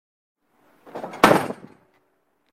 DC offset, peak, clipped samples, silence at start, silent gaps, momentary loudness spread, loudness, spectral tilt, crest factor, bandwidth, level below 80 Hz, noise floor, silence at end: under 0.1%; 0 dBFS; under 0.1%; 0.95 s; none; 22 LU; -19 LUFS; -4.5 dB/octave; 26 dB; 16 kHz; -56 dBFS; -68 dBFS; 1 s